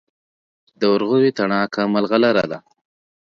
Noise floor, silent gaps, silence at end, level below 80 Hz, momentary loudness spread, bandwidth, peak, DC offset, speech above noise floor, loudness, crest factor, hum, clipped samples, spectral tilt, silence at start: under -90 dBFS; none; 0.65 s; -62 dBFS; 6 LU; 7 kHz; -2 dBFS; under 0.1%; over 72 dB; -18 LUFS; 18 dB; none; under 0.1%; -6.5 dB/octave; 0.8 s